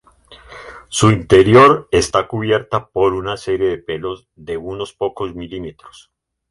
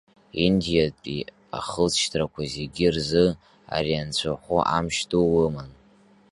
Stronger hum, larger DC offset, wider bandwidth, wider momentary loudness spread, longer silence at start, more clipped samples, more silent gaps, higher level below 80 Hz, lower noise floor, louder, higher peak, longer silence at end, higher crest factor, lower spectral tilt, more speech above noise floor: neither; neither; about the same, 11.5 kHz vs 11.5 kHz; first, 20 LU vs 12 LU; about the same, 0.3 s vs 0.35 s; neither; neither; about the same, -42 dBFS vs -46 dBFS; second, -44 dBFS vs -56 dBFS; first, -15 LUFS vs -24 LUFS; first, 0 dBFS vs -4 dBFS; about the same, 0.65 s vs 0.6 s; about the same, 16 dB vs 20 dB; about the same, -5.5 dB/octave vs -5 dB/octave; second, 28 dB vs 32 dB